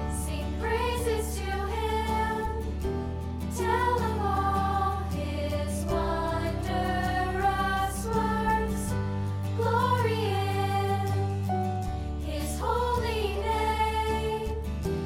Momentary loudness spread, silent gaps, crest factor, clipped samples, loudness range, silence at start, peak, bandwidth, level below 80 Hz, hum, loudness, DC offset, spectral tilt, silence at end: 6 LU; none; 14 dB; under 0.1%; 2 LU; 0 s; -14 dBFS; 16.5 kHz; -36 dBFS; none; -29 LUFS; under 0.1%; -6 dB/octave; 0 s